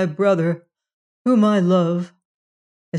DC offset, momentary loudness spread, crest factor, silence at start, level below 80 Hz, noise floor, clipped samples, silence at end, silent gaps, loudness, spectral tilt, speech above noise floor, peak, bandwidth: under 0.1%; 12 LU; 14 dB; 0 s; -74 dBFS; under -90 dBFS; under 0.1%; 0 s; 0.94-1.25 s, 2.25-2.92 s; -19 LUFS; -8 dB/octave; over 73 dB; -6 dBFS; 10 kHz